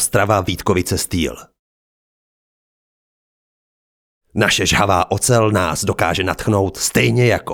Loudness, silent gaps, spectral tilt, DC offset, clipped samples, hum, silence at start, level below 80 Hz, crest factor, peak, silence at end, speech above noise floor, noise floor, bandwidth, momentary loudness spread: -16 LUFS; 1.59-4.21 s; -4 dB/octave; under 0.1%; under 0.1%; none; 0 s; -42 dBFS; 18 dB; 0 dBFS; 0 s; over 74 dB; under -90 dBFS; over 20 kHz; 5 LU